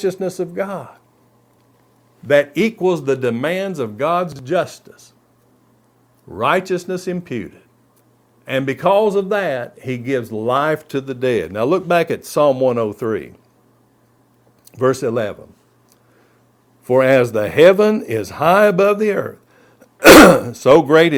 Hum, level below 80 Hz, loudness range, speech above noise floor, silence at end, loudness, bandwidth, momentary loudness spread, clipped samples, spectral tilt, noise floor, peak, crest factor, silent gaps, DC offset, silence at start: none; -46 dBFS; 12 LU; 41 dB; 0 s; -15 LUFS; over 20 kHz; 15 LU; 0.5%; -5 dB/octave; -56 dBFS; 0 dBFS; 16 dB; none; under 0.1%; 0 s